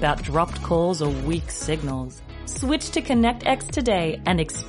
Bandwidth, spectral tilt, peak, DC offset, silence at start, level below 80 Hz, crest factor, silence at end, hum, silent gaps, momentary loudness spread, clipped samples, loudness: 11.5 kHz; -5 dB/octave; -6 dBFS; under 0.1%; 0 s; -34 dBFS; 16 dB; 0 s; none; none; 9 LU; under 0.1%; -24 LUFS